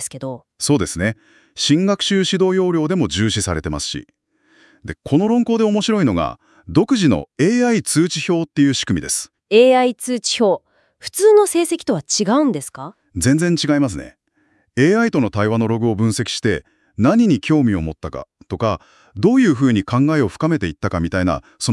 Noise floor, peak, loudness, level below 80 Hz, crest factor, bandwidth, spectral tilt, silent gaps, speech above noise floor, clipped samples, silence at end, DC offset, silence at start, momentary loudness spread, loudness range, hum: -61 dBFS; -2 dBFS; -17 LUFS; -46 dBFS; 16 dB; 12 kHz; -5 dB/octave; none; 45 dB; under 0.1%; 0 s; under 0.1%; 0 s; 13 LU; 3 LU; none